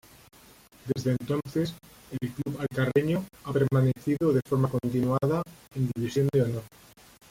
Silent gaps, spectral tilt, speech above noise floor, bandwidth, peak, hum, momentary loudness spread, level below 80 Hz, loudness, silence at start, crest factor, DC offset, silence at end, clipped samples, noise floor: none; -7.5 dB/octave; 27 dB; 16 kHz; -10 dBFS; none; 10 LU; -58 dBFS; -28 LUFS; 0.85 s; 18 dB; under 0.1%; 0.65 s; under 0.1%; -55 dBFS